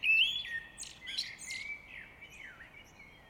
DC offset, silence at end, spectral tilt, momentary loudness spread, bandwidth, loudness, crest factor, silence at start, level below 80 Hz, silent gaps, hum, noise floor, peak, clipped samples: under 0.1%; 0 s; 1 dB/octave; 24 LU; 17.5 kHz; -34 LUFS; 20 dB; 0 s; -66 dBFS; none; none; -56 dBFS; -18 dBFS; under 0.1%